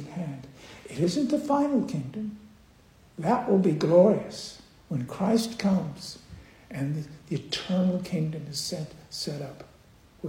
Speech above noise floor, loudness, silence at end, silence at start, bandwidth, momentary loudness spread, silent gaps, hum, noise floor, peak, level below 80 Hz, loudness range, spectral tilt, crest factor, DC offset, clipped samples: 30 dB; -27 LUFS; 0 s; 0 s; 16.5 kHz; 18 LU; none; none; -56 dBFS; -8 dBFS; -60 dBFS; 6 LU; -6.5 dB/octave; 20 dB; under 0.1%; under 0.1%